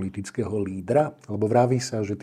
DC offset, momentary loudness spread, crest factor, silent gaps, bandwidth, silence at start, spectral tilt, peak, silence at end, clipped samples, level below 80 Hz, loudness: under 0.1%; 9 LU; 18 dB; none; 13 kHz; 0 s; -6.5 dB/octave; -8 dBFS; 0 s; under 0.1%; -64 dBFS; -25 LUFS